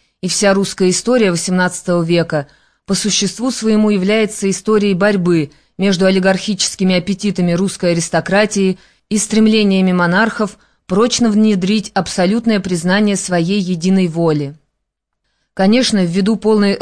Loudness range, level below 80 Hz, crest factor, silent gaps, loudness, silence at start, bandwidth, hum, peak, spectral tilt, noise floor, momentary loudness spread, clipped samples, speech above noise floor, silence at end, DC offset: 2 LU; -48 dBFS; 14 dB; none; -14 LUFS; 0.25 s; 11 kHz; none; -2 dBFS; -5 dB/octave; -74 dBFS; 6 LU; under 0.1%; 60 dB; 0 s; 0.4%